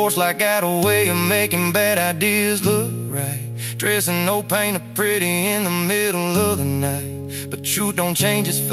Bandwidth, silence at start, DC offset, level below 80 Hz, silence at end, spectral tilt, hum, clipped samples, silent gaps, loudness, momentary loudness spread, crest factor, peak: 16 kHz; 0 s; under 0.1%; -56 dBFS; 0 s; -4 dB/octave; none; under 0.1%; none; -19 LUFS; 7 LU; 16 dB; -4 dBFS